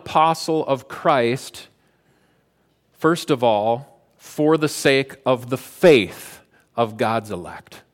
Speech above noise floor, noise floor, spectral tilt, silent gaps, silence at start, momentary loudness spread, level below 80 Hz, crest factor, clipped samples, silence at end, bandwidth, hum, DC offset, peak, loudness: 44 dB; -64 dBFS; -5 dB/octave; none; 0.05 s; 17 LU; -62 dBFS; 18 dB; under 0.1%; 0.15 s; 17 kHz; none; under 0.1%; -2 dBFS; -20 LUFS